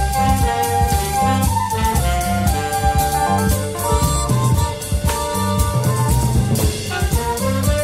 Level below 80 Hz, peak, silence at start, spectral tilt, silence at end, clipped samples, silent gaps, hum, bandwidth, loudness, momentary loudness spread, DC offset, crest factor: -24 dBFS; -4 dBFS; 0 s; -5 dB/octave; 0 s; under 0.1%; none; none; 16.5 kHz; -18 LUFS; 3 LU; under 0.1%; 12 dB